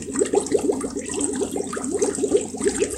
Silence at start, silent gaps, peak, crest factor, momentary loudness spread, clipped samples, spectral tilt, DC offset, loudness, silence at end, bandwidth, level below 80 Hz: 0 s; none; -6 dBFS; 18 dB; 6 LU; under 0.1%; -3.5 dB/octave; under 0.1%; -23 LUFS; 0 s; 15 kHz; -50 dBFS